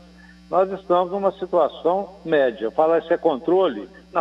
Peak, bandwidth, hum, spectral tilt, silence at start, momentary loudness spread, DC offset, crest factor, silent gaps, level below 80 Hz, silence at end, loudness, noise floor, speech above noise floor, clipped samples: -6 dBFS; 7.4 kHz; none; -7.5 dB/octave; 0.5 s; 5 LU; under 0.1%; 16 dB; none; -56 dBFS; 0 s; -21 LUFS; -47 dBFS; 26 dB; under 0.1%